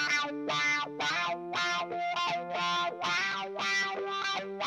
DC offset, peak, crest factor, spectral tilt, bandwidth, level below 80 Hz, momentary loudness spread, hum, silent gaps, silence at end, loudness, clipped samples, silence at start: under 0.1%; -18 dBFS; 14 dB; -2 dB/octave; 13 kHz; -82 dBFS; 4 LU; none; none; 0 s; -31 LUFS; under 0.1%; 0 s